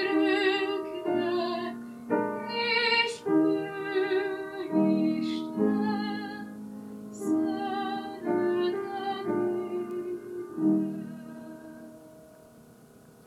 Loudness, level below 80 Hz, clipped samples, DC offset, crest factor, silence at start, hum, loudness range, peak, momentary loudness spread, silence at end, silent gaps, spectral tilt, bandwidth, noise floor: -29 LUFS; -72 dBFS; under 0.1%; under 0.1%; 18 dB; 0 s; none; 6 LU; -10 dBFS; 16 LU; 0.4 s; none; -5.5 dB/octave; 13 kHz; -54 dBFS